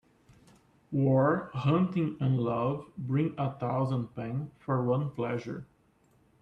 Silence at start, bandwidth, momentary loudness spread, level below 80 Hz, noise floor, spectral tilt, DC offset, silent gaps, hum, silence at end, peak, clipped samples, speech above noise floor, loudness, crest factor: 0.9 s; 6.2 kHz; 10 LU; -66 dBFS; -66 dBFS; -9.5 dB/octave; under 0.1%; none; none; 0.8 s; -14 dBFS; under 0.1%; 37 dB; -30 LUFS; 16 dB